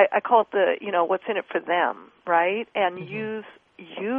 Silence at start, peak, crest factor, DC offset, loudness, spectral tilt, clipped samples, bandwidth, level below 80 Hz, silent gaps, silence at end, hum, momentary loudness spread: 0 s; -4 dBFS; 20 dB; under 0.1%; -24 LUFS; -8 dB/octave; under 0.1%; 4 kHz; -74 dBFS; none; 0 s; none; 13 LU